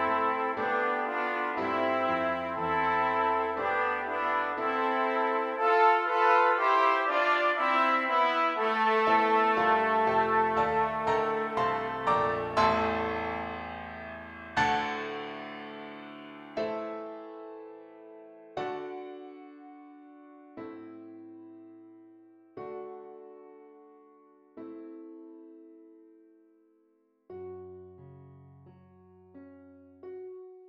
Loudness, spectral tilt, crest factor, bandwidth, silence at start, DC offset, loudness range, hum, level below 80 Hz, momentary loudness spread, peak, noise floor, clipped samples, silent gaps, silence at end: -27 LUFS; -5 dB/octave; 20 dB; 10.5 kHz; 0 s; under 0.1%; 23 LU; none; -62 dBFS; 23 LU; -12 dBFS; -69 dBFS; under 0.1%; none; 0 s